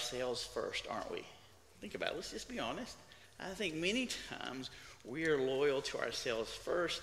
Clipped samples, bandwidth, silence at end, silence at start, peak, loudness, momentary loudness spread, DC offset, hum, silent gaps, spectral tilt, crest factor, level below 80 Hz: under 0.1%; 15.5 kHz; 0 s; 0 s; -18 dBFS; -39 LUFS; 14 LU; under 0.1%; none; none; -3 dB/octave; 22 dB; -64 dBFS